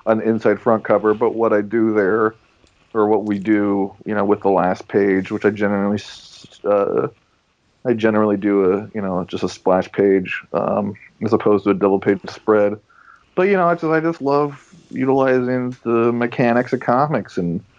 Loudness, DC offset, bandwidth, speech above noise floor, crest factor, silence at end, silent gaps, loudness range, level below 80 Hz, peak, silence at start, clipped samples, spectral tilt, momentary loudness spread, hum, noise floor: -18 LUFS; under 0.1%; 7.6 kHz; 44 dB; 16 dB; 0.2 s; none; 2 LU; -64 dBFS; -2 dBFS; 0.05 s; under 0.1%; -8 dB/octave; 7 LU; none; -62 dBFS